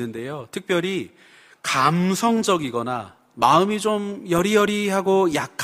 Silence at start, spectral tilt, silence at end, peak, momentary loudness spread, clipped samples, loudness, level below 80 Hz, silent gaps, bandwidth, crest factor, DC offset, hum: 0 s; -5 dB/octave; 0 s; -2 dBFS; 13 LU; under 0.1%; -21 LUFS; -58 dBFS; none; 15.5 kHz; 18 dB; under 0.1%; none